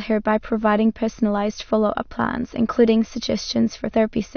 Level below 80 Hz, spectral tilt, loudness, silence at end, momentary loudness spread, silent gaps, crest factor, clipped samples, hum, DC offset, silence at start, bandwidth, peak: -44 dBFS; -5.5 dB/octave; -21 LUFS; 0.1 s; 6 LU; none; 16 dB; under 0.1%; none; under 0.1%; 0 s; 6.6 kHz; -4 dBFS